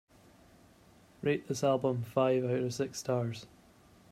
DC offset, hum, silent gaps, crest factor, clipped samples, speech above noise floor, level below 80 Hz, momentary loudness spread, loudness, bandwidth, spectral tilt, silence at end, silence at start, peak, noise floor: under 0.1%; none; none; 20 dB; under 0.1%; 29 dB; -70 dBFS; 7 LU; -32 LUFS; 15.5 kHz; -6 dB/octave; 0.65 s; 1.2 s; -14 dBFS; -61 dBFS